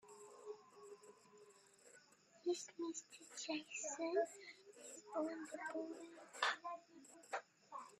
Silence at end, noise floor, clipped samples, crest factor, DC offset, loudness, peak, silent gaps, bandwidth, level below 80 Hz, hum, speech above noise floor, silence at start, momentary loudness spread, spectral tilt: 0.05 s; -69 dBFS; under 0.1%; 26 dB; under 0.1%; -47 LUFS; -22 dBFS; none; 13.5 kHz; under -90 dBFS; none; 23 dB; 0.05 s; 23 LU; -1 dB/octave